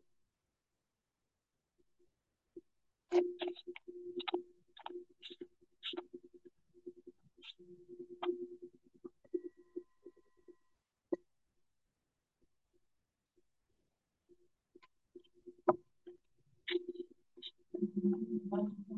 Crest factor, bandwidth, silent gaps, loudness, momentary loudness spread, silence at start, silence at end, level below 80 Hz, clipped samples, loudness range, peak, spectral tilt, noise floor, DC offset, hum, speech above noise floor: 30 dB; 7.2 kHz; none; -42 LUFS; 24 LU; 2.55 s; 0 s; -88 dBFS; under 0.1%; 12 LU; -14 dBFS; -4.5 dB/octave; -89 dBFS; under 0.1%; none; 50 dB